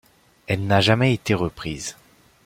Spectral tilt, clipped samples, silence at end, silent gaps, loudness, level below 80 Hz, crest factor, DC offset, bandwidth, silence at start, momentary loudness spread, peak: -5.5 dB/octave; under 0.1%; 0.55 s; none; -21 LUFS; -50 dBFS; 20 dB; under 0.1%; 16 kHz; 0.5 s; 13 LU; -2 dBFS